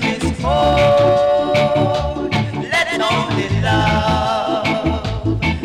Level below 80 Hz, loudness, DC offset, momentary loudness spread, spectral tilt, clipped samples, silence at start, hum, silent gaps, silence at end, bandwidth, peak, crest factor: -30 dBFS; -16 LUFS; under 0.1%; 7 LU; -6 dB/octave; under 0.1%; 0 s; none; none; 0 s; 13.5 kHz; -6 dBFS; 10 dB